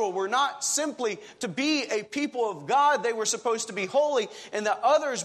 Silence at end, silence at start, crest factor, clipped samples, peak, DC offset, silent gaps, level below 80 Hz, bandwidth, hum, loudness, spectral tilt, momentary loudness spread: 0 s; 0 s; 16 dB; under 0.1%; -12 dBFS; under 0.1%; none; -80 dBFS; 13.5 kHz; none; -26 LUFS; -2 dB/octave; 8 LU